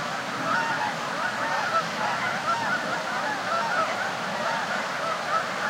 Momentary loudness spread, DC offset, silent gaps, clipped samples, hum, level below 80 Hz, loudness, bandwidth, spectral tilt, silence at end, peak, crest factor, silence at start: 3 LU; under 0.1%; none; under 0.1%; none; -70 dBFS; -26 LUFS; 16.5 kHz; -3 dB/octave; 0 s; -12 dBFS; 14 dB; 0 s